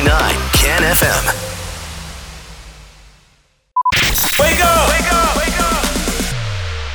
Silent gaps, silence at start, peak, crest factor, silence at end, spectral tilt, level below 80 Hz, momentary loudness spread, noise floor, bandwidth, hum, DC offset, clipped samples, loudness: none; 0 s; -2 dBFS; 14 dB; 0 s; -3 dB/octave; -24 dBFS; 17 LU; -55 dBFS; over 20 kHz; none; under 0.1%; under 0.1%; -14 LUFS